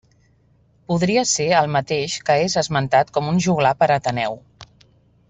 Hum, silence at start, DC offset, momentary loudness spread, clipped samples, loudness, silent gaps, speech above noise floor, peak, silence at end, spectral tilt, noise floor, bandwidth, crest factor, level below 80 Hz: none; 0.9 s; under 0.1%; 7 LU; under 0.1%; -19 LUFS; none; 39 dB; -2 dBFS; 0.65 s; -4.5 dB/octave; -57 dBFS; 8.4 kHz; 18 dB; -54 dBFS